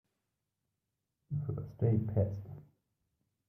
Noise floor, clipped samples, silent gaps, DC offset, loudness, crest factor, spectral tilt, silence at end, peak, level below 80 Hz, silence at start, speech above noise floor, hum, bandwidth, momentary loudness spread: -87 dBFS; under 0.1%; none; under 0.1%; -35 LUFS; 20 dB; -12.5 dB/octave; 0.85 s; -18 dBFS; -64 dBFS; 1.3 s; 53 dB; none; 2.7 kHz; 17 LU